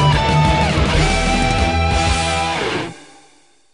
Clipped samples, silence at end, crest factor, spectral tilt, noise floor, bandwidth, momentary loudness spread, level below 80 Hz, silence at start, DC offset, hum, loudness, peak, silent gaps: under 0.1%; 0.7 s; 14 dB; -5 dB/octave; -53 dBFS; 11 kHz; 6 LU; -24 dBFS; 0 s; 0.4%; none; -16 LUFS; -2 dBFS; none